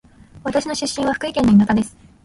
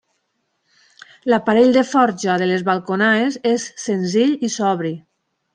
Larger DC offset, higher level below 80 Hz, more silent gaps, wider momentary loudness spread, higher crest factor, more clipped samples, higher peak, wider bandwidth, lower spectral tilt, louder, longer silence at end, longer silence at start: neither; first, -44 dBFS vs -66 dBFS; neither; about the same, 11 LU vs 10 LU; about the same, 16 dB vs 16 dB; neither; about the same, -4 dBFS vs -2 dBFS; first, 11.5 kHz vs 10 kHz; about the same, -5.5 dB/octave vs -5 dB/octave; about the same, -18 LUFS vs -18 LUFS; second, 0.35 s vs 0.55 s; second, 0.35 s vs 1.25 s